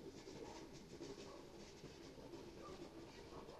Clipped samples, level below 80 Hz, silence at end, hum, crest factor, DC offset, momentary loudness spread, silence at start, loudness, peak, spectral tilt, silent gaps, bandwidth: under 0.1%; -70 dBFS; 0 s; none; 14 dB; under 0.1%; 3 LU; 0 s; -56 LUFS; -40 dBFS; -4.5 dB/octave; none; 13 kHz